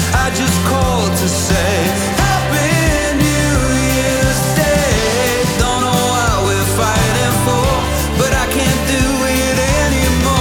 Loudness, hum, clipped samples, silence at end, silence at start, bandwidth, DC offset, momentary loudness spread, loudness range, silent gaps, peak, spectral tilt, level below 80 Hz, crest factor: -14 LUFS; none; under 0.1%; 0 s; 0 s; over 20 kHz; under 0.1%; 1 LU; 1 LU; none; -2 dBFS; -4 dB/octave; -24 dBFS; 12 dB